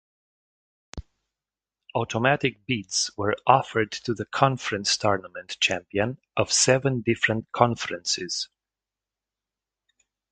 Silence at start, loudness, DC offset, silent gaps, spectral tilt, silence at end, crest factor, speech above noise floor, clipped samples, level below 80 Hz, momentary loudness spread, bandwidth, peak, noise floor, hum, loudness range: 0.95 s; -24 LUFS; under 0.1%; none; -3.5 dB/octave; 1.85 s; 26 dB; over 65 dB; under 0.1%; -54 dBFS; 10 LU; 9.4 kHz; -2 dBFS; under -90 dBFS; none; 4 LU